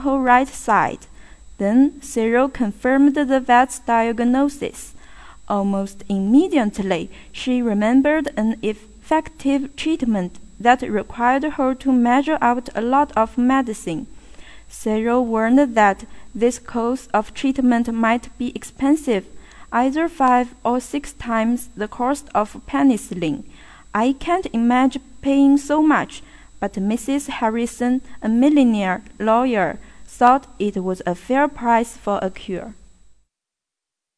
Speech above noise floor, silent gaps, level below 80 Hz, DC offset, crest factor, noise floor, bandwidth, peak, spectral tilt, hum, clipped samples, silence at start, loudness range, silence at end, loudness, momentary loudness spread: 67 dB; none; -46 dBFS; under 0.1%; 18 dB; -86 dBFS; 11 kHz; 0 dBFS; -5.5 dB/octave; none; under 0.1%; 0 s; 3 LU; 1.45 s; -19 LUFS; 12 LU